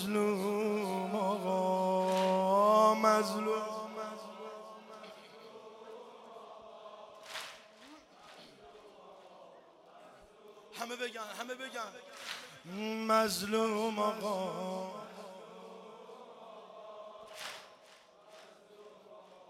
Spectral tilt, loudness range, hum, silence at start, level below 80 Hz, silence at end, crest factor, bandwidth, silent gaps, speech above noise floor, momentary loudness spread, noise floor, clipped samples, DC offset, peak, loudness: -4.5 dB/octave; 21 LU; none; 0 s; -80 dBFS; 0.05 s; 22 dB; 16.5 kHz; none; 24 dB; 26 LU; -60 dBFS; under 0.1%; under 0.1%; -14 dBFS; -33 LUFS